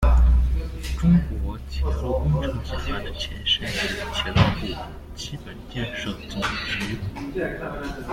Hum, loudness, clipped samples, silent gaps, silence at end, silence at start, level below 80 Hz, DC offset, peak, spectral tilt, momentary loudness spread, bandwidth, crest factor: none; -25 LUFS; under 0.1%; none; 0 s; 0 s; -26 dBFS; under 0.1%; -4 dBFS; -5.5 dB/octave; 13 LU; 13.5 kHz; 18 dB